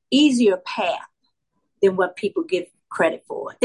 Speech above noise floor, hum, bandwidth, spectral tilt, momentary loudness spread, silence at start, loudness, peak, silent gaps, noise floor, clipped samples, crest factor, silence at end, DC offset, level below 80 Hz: 54 dB; none; 11.5 kHz; -4.5 dB/octave; 14 LU; 0.1 s; -21 LUFS; -6 dBFS; none; -74 dBFS; under 0.1%; 16 dB; 0 s; under 0.1%; -70 dBFS